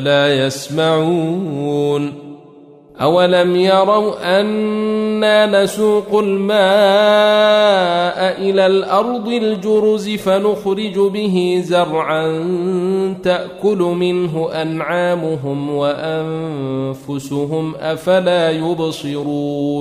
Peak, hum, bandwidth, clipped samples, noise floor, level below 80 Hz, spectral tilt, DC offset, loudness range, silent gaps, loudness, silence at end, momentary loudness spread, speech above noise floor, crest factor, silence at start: -2 dBFS; none; 15 kHz; under 0.1%; -42 dBFS; -56 dBFS; -5.5 dB/octave; under 0.1%; 6 LU; none; -15 LUFS; 0 s; 9 LU; 27 dB; 14 dB; 0 s